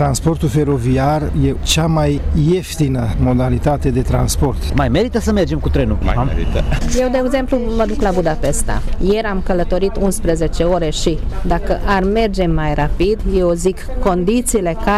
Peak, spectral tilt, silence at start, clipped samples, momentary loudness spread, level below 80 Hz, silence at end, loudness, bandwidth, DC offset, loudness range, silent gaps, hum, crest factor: -4 dBFS; -6 dB/octave; 0 s; under 0.1%; 3 LU; -20 dBFS; 0 s; -16 LUFS; 15 kHz; under 0.1%; 2 LU; none; none; 12 dB